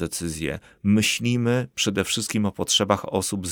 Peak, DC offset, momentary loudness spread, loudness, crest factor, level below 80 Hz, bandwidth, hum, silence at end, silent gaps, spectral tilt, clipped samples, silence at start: -4 dBFS; under 0.1%; 8 LU; -23 LUFS; 20 dB; -50 dBFS; over 20 kHz; none; 0 s; none; -4 dB/octave; under 0.1%; 0 s